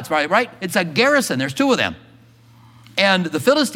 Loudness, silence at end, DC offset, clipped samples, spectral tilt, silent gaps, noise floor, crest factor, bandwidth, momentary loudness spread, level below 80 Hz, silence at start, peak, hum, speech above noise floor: -18 LUFS; 0 s; under 0.1%; under 0.1%; -4 dB/octave; none; -48 dBFS; 18 dB; 17 kHz; 6 LU; -60 dBFS; 0 s; 0 dBFS; none; 30 dB